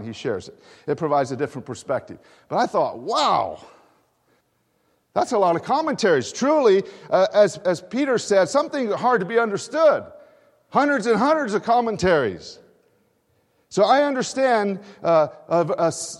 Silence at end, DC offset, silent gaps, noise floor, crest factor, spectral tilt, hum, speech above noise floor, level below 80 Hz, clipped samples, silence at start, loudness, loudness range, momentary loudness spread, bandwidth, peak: 0 s; under 0.1%; none; -67 dBFS; 18 dB; -4.5 dB/octave; none; 46 dB; -60 dBFS; under 0.1%; 0 s; -21 LUFS; 5 LU; 10 LU; 12 kHz; -4 dBFS